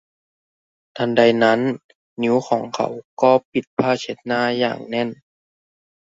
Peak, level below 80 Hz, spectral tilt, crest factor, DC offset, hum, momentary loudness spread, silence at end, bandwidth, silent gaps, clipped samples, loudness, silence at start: -2 dBFS; -64 dBFS; -5.5 dB/octave; 20 dB; under 0.1%; none; 10 LU; 0.9 s; 7.8 kHz; 1.84-1.89 s, 1.95-2.16 s, 3.04-3.17 s, 3.45-3.52 s, 3.67-3.77 s; under 0.1%; -20 LUFS; 0.95 s